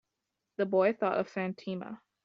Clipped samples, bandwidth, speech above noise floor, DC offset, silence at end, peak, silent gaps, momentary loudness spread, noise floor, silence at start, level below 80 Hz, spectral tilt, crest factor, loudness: under 0.1%; 6.8 kHz; 55 dB; under 0.1%; 0.3 s; -14 dBFS; none; 15 LU; -86 dBFS; 0.6 s; -78 dBFS; -5.5 dB/octave; 18 dB; -32 LUFS